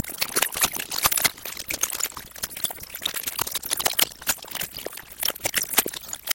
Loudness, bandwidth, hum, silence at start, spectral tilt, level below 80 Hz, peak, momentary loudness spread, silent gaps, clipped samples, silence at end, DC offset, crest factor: -24 LUFS; 17.5 kHz; none; 0 s; 0 dB/octave; -54 dBFS; 0 dBFS; 10 LU; none; under 0.1%; 0 s; under 0.1%; 28 dB